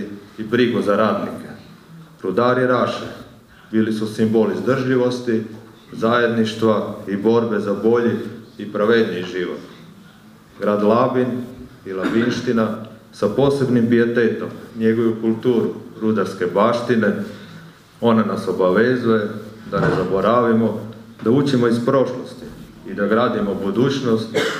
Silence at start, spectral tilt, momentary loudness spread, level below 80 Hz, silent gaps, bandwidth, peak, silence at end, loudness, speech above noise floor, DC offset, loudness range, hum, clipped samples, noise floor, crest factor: 0 s; -7 dB/octave; 16 LU; -54 dBFS; none; 14.5 kHz; -2 dBFS; 0 s; -19 LUFS; 27 dB; under 0.1%; 3 LU; none; under 0.1%; -45 dBFS; 16 dB